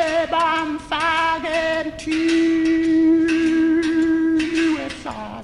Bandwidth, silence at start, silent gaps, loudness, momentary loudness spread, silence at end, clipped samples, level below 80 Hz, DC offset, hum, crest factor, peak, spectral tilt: 10.5 kHz; 0 s; none; -19 LUFS; 8 LU; 0 s; under 0.1%; -46 dBFS; under 0.1%; none; 10 dB; -8 dBFS; -4.5 dB/octave